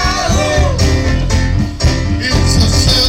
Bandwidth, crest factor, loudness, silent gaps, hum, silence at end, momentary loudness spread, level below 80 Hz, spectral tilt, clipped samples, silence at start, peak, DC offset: 16 kHz; 10 dB; -13 LUFS; none; none; 0 s; 4 LU; -16 dBFS; -4.5 dB/octave; under 0.1%; 0 s; -2 dBFS; under 0.1%